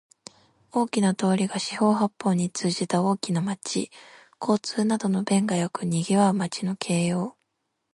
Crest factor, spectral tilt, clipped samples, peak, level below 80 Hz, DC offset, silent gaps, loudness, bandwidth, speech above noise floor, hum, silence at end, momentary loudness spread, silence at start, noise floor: 18 dB; -5.5 dB/octave; under 0.1%; -8 dBFS; -68 dBFS; under 0.1%; none; -25 LUFS; 11.5 kHz; 54 dB; none; 0.6 s; 7 LU; 0.75 s; -78 dBFS